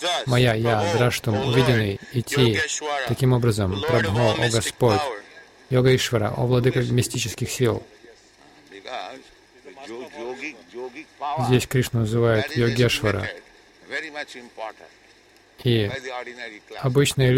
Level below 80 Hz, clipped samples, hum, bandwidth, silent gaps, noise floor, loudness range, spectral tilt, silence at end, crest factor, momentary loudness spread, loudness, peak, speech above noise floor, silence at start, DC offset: -48 dBFS; under 0.1%; none; 16.5 kHz; none; -54 dBFS; 9 LU; -5 dB/octave; 0 s; 18 dB; 17 LU; -22 LUFS; -4 dBFS; 32 dB; 0 s; under 0.1%